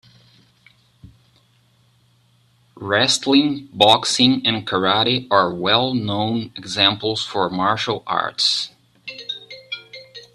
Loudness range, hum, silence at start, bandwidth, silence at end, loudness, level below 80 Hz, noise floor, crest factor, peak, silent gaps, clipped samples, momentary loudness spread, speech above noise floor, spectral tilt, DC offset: 6 LU; none; 1.05 s; 12.5 kHz; 0.1 s; -18 LUFS; -60 dBFS; -58 dBFS; 20 dB; 0 dBFS; none; under 0.1%; 17 LU; 40 dB; -3.5 dB/octave; under 0.1%